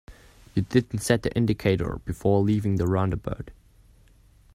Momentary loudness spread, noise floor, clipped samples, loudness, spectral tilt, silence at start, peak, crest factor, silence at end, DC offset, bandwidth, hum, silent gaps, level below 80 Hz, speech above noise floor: 9 LU; -56 dBFS; under 0.1%; -25 LUFS; -6.5 dB/octave; 0.1 s; -6 dBFS; 20 dB; 1 s; under 0.1%; 15 kHz; none; none; -44 dBFS; 32 dB